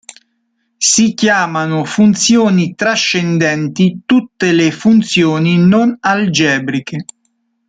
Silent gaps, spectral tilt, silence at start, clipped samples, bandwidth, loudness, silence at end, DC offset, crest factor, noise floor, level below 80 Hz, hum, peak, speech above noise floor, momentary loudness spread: none; -4.5 dB/octave; 0.8 s; under 0.1%; 9.4 kHz; -12 LUFS; 0.65 s; under 0.1%; 12 dB; -65 dBFS; -52 dBFS; none; 0 dBFS; 53 dB; 6 LU